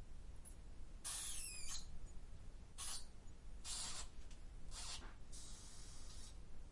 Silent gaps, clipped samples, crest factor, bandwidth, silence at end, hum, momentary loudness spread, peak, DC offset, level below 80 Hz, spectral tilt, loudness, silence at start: none; under 0.1%; 16 dB; 11.5 kHz; 0 s; none; 15 LU; -34 dBFS; under 0.1%; -54 dBFS; -1.5 dB/octave; -51 LUFS; 0 s